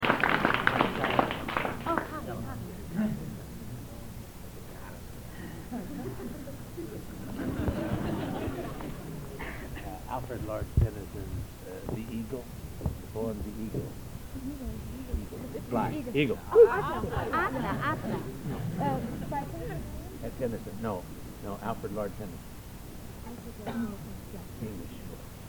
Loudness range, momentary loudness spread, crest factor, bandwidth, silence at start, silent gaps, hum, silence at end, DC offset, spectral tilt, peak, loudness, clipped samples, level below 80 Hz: 12 LU; 16 LU; 28 dB; 19.5 kHz; 0 s; none; none; 0 s; under 0.1%; -6 dB/octave; -6 dBFS; -33 LUFS; under 0.1%; -44 dBFS